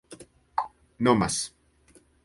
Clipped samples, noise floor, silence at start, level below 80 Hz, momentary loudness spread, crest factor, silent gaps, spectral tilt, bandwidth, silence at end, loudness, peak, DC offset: under 0.1%; -60 dBFS; 0.1 s; -56 dBFS; 22 LU; 22 dB; none; -4.5 dB/octave; 11.5 kHz; 0.75 s; -27 LUFS; -8 dBFS; under 0.1%